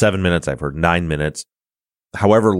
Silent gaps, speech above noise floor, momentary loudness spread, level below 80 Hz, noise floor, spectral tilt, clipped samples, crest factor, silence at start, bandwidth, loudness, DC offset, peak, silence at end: none; over 73 dB; 18 LU; -38 dBFS; under -90 dBFS; -6 dB/octave; under 0.1%; 16 dB; 0 s; 14.5 kHz; -18 LUFS; under 0.1%; -2 dBFS; 0 s